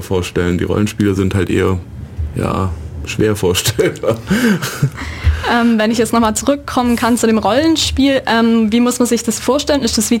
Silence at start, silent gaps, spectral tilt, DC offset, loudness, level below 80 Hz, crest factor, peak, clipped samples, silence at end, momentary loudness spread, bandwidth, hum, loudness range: 0 s; none; -5 dB/octave; under 0.1%; -15 LUFS; -30 dBFS; 12 dB; -2 dBFS; under 0.1%; 0 s; 7 LU; 17 kHz; none; 4 LU